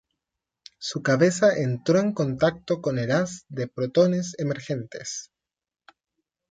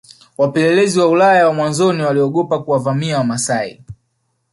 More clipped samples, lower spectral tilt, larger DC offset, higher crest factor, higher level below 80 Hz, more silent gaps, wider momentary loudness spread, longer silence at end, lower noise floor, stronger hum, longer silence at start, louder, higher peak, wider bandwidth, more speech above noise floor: neither; about the same, -5.5 dB/octave vs -5 dB/octave; neither; about the same, 18 dB vs 14 dB; second, -62 dBFS vs -56 dBFS; neither; first, 12 LU vs 8 LU; first, 1.25 s vs 0.6 s; first, -90 dBFS vs -67 dBFS; neither; first, 0.8 s vs 0.4 s; second, -24 LUFS vs -15 LUFS; second, -6 dBFS vs -2 dBFS; second, 9.4 kHz vs 11.5 kHz; first, 66 dB vs 53 dB